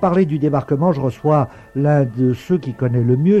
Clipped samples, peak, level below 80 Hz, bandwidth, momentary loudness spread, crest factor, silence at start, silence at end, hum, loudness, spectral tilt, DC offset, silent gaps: under 0.1%; -4 dBFS; -50 dBFS; 8.2 kHz; 4 LU; 12 dB; 0 s; 0 s; none; -18 LUFS; -10 dB/octave; under 0.1%; none